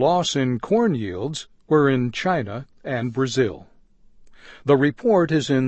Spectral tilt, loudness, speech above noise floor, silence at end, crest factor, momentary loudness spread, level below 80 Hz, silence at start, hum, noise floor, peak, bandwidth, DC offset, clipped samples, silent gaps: -6 dB/octave; -21 LUFS; 31 dB; 0 s; 18 dB; 12 LU; -54 dBFS; 0 s; none; -52 dBFS; -4 dBFS; 8.6 kHz; under 0.1%; under 0.1%; none